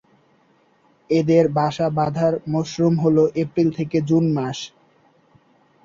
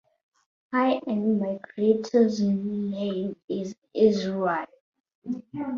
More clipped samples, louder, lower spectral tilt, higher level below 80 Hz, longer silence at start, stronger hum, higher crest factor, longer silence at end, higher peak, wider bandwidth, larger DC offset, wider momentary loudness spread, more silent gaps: neither; first, -20 LUFS vs -26 LUFS; about the same, -7.5 dB/octave vs -7 dB/octave; first, -56 dBFS vs -68 dBFS; first, 1.1 s vs 0.7 s; neither; about the same, 18 dB vs 18 dB; first, 1.2 s vs 0 s; first, -4 dBFS vs -8 dBFS; about the same, 7.6 kHz vs 7.2 kHz; neither; second, 7 LU vs 12 LU; second, none vs 3.44-3.48 s, 3.78-3.82 s, 4.81-4.93 s, 5.00-5.04 s, 5.15-5.22 s